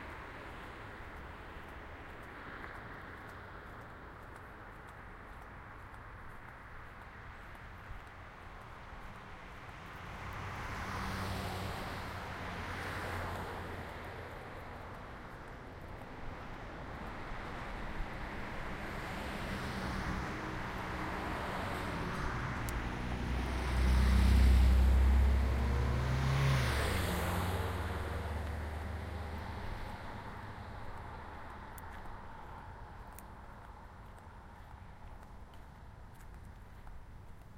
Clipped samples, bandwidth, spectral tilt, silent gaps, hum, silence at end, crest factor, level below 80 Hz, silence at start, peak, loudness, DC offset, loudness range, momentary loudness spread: under 0.1%; 16 kHz; -6 dB/octave; none; none; 0 s; 20 dB; -40 dBFS; 0 s; -16 dBFS; -38 LUFS; under 0.1%; 20 LU; 20 LU